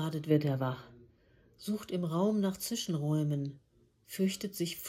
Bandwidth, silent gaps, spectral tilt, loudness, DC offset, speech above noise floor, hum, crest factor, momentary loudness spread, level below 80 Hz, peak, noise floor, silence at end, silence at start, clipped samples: 17 kHz; none; -6 dB/octave; -33 LUFS; under 0.1%; 32 dB; none; 20 dB; 10 LU; -70 dBFS; -14 dBFS; -65 dBFS; 0 s; 0 s; under 0.1%